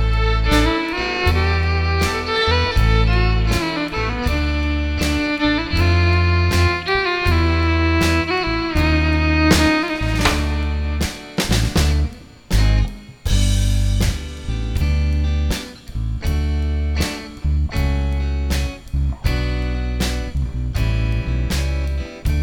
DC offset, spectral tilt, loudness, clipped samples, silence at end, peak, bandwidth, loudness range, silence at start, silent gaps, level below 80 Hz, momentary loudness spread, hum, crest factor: under 0.1%; -5.5 dB/octave; -19 LUFS; under 0.1%; 0 s; -2 dBFS; 18.5 kHz; 5 LU; 0 s; none; -22 dBFS; 8 LU; none; 16 dB